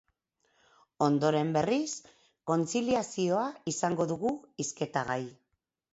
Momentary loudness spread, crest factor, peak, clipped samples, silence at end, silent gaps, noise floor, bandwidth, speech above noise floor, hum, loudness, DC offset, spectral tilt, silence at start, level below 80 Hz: 9 LU; 20 dB; -12 dBFS; under 0.1%; 0.6 s; none; -81 dBFS; 8.2 kHz; 51 dB; none; -31 LUFS; under 0.1%; -5 dB/octave; 1 s; -68 dBFS